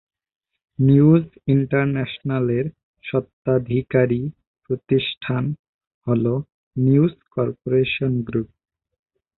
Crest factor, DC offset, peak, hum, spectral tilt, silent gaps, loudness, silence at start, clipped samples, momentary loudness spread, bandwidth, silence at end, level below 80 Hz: 18 dB; under 0.1%; -4 dBFS; none; -12.5 dB/octave; 2.83-2.94 s, 3.33-3.43 s, 4.47-4.54 s, 5.17-5.21 s, 5.59-5.79 s, 5.87-6.01 s, 6.54-6.71 s; -21 LUFS; 0.8 s; under 0.1%; 12 LU; 4.2 kHz; 0.9 s; -52 dBFS